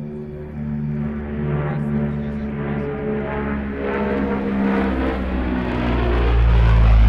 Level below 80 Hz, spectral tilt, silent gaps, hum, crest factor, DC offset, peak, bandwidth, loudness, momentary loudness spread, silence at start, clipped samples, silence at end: -22 dBFS; -9.5 dB/octave; none; none; 12 dB; under 0.1%; -6 dBFS; 5.2 kHz; -22 LUFS; 9 LU; 0 s; under 0.1%; 0 s